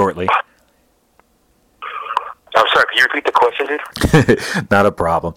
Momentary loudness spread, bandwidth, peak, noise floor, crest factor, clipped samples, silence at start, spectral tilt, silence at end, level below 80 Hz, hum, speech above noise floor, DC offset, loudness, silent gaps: 12 LU; 17 kHz; -2 dBFS; -58 dBFS; 14 dB; under 0.1%; 0 s; -5 dB/octave; 0.05 s; -38 dBFS; none; 43 dB; under 0.1%; -15 LUFS; none